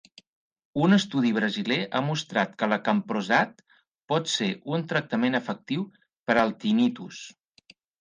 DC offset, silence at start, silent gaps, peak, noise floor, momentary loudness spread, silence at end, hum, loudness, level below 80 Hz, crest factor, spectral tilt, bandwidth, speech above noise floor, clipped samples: under 0.1%; 0.75 s; 3.88-3.95 s, 6.19-6.26 s; -6 dBFS; -59 dBFS; 11 LU; 0.7 s; none; -26 LUFS; -68 dBFS; 20 dB; -5 dB/octave; 9.8 kHz; 33 dB; under 0.1%